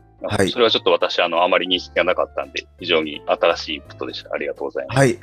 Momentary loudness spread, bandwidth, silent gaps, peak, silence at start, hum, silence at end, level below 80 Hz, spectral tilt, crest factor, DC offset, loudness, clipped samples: 11 LU; 14.5 kHz; none; -2 dBFS; 0.2 s; none; 0.05 s; -48 dBFS; -4.5 dB/octave; 18 dB; under 0.1%; -20 LUFS; under 0.1%